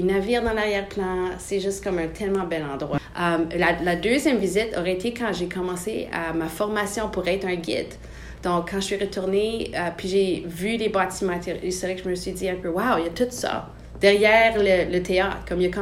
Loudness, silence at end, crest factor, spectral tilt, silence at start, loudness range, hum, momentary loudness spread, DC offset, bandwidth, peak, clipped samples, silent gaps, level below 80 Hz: -24 LUFS; 0 s; 20 dB; -4.5 dB/octave; 0 s; 5 LU; none; 8 LU; under 0.1%; 16 kHz; -4 dBFS; under 0.1%; none; -44 dBFS